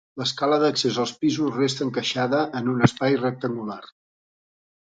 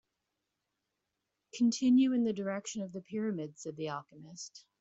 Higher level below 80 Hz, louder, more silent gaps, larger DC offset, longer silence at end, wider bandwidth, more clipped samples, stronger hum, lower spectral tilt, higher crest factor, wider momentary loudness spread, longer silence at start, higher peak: first, -62 dBFS vs -78 dBFS; first, -23 LUFS vs -33 LUFS; neither; neither; first, 1 s vs 0.2 s; first, 9.2 kHz vs 8 kHz; neither; neither; about the same, -5 dB/octave vs -5 dB/octave; first, 24 dB vs 16 dB; second, 9 LU vs 20 LU; second, 0.15 s vs 1.55 s; first, 0 dBFS vs -20 dBFS